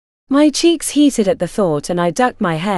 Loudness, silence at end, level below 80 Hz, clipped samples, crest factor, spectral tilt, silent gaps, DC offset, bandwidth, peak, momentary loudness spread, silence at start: -15 LUFS; 0 s; -44 dBFS; under 0.1%; 14 dB; -4.5 dB/octave; none; under 0.1%; 13.5 kHz; 0 dBFS; 5 LU; 0.3 s